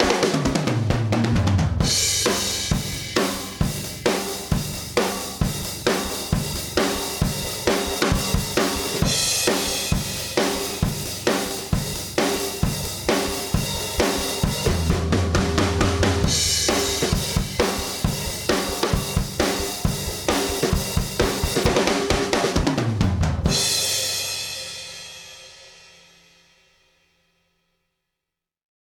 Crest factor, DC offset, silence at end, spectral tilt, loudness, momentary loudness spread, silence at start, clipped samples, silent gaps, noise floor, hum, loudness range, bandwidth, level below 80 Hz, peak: 20 dB; under 0.1%; 3.1 s; -4 dB/octave; -22 LUFS; 6 LU; 0 s; under 0.1%; none; -85 dBFS; none; 4 LU; 19 kHz; -34 dBFS; -4 dBFS